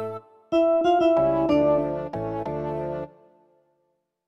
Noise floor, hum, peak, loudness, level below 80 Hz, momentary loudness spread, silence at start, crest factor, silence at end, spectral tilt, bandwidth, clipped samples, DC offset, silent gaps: -73 dBFS; none; -10 dBFS; -23 LUFS; -54 dBFS; 15 LU; 0 s; 14 dB; 1.2 s; -8 dB/octave; 7.6 kHz; under 0.1%; under 0.1%; none